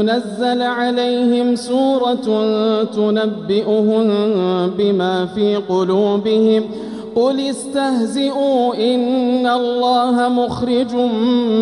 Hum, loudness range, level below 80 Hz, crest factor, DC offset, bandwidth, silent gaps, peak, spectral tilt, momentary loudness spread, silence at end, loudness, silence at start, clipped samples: none; 1 LU; -56 dBFS; 12 dB; under 0.1%; 11.5 kHz; none; -4 dBFS; -6 dB/octave; 4 LU; 0 s; -16 LUFS; 0 s; under 0.1%